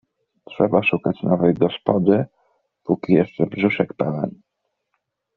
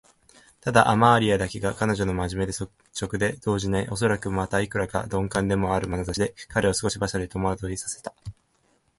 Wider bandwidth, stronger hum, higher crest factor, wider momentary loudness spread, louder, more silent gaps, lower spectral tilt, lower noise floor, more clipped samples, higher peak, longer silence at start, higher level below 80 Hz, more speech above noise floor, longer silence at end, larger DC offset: second, 4.6 kHz vs 11.5 kHz; neither; about the same, 20 dB vs 24 dB; second, 10 LU vs 14 LU; first, -20 LUFS vs -25 LUFS; neither; first, -6.5 dB/octave vs -5 dB/octave; first, -77 dBFS vs -67 dBFS; neither; about the same, 0 dBFS vs 0 dBFS; second, 0.5 s vs 0.65 s; second, -56 dBFS vs -44 dBFS; first, 58 dB vs 42 dB; first, 1.05 s vs 0.7 s; neither